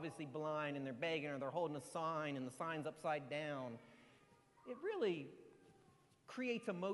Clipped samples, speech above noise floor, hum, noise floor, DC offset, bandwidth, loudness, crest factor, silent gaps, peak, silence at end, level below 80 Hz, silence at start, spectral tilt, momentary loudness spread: under 0.1%; 27 dB; none; -71 dBFS; under 0.1%; 11.5 kHz; -44 LUFS; 16 dB; none; -28 dBFS; 0 s; -86 dBFS; 0 s; -5.5 dB/octave; 13 LU